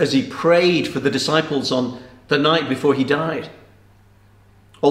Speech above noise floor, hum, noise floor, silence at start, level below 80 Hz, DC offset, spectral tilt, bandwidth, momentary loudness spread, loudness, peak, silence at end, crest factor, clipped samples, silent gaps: 33 dB; 50 Hz at -55 dBFS; -51 dBFS; 0 s; -56 dBFS; under 0.1%; -5 dB/octave; 14.5 kHz; 11 LU; -19 LUFS; -2 dBFS; 0 s; 18 dB; under 0.1%; none